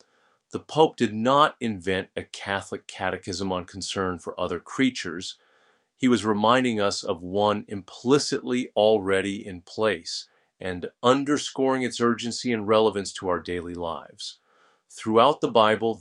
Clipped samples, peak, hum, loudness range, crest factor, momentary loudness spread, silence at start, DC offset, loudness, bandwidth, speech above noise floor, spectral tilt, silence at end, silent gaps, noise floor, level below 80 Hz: under 0.1%; -2 dBFS; none; 5 LU; 22 dB; 14 LU; 0.55 s; under 0.1%; -25 LUFS; 11 kHz; 41 dB; -4.5 dB/octave; 0 s; none; -65 dBFS; -62 dBFS